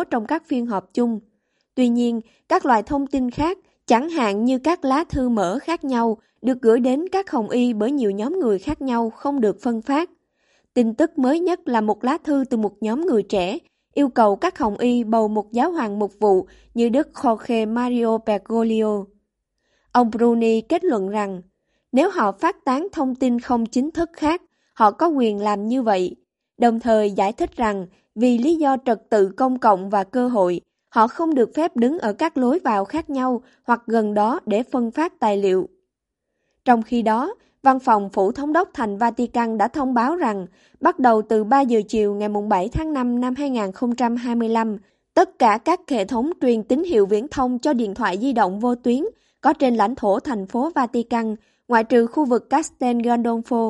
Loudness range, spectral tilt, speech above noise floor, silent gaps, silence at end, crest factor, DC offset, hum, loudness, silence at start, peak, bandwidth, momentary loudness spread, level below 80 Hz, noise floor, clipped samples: 2 LU; -6 dB/octave; 60 dB; none; 0 s; 18 dB; under 0.1%; none; -20 LUFS; 0 s; -2 dBFS; 11.5 kHz; 6 LU; -50 dBFS; -79 dBFS; under 0.1%